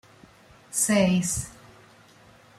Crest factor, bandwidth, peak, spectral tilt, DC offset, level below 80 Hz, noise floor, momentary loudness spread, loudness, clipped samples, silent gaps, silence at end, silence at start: 18 dB; 15.5 kHz; -10 dBFS; -4 dB/octave; under 0.1%; -54 dBFS; -54 dBFS; 10 LU; -24 LUFS; under 0.1%; none; 1.1 s; 0.7 s